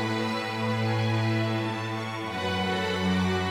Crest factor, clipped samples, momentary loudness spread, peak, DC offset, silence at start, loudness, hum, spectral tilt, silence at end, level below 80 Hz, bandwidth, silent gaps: 12 dB; under 0.1%; 5 LU; -16 dBFS; under 0.1%; 0 s; -28 LUFS; none; -6 dB/octave; 0 s; -62 dBFS; 14 kHz; none